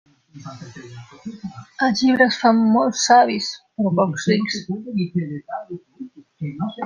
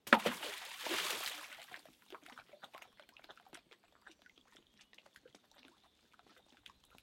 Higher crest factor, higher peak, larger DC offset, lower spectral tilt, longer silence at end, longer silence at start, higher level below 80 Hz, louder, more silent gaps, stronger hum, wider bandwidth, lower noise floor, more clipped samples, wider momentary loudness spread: second, 18 dB vs 38 dB; first, -2 dBFS vs -6 dBFS; neither; first, -4.5 dB/octave vs -2 dB/octave; second, 0 s vs 2.9 s; first, 0.35 s vs 0.05 s; first, -64 dBFS vs -82 dBFS; first, -19 LUFS vs -38 LUFS; neither; neither; second, 10 kHz vs 16.5 kHz; second, -39 dBFS vs -70 dBFS; neither; about the same, 24 LU vs 26 LU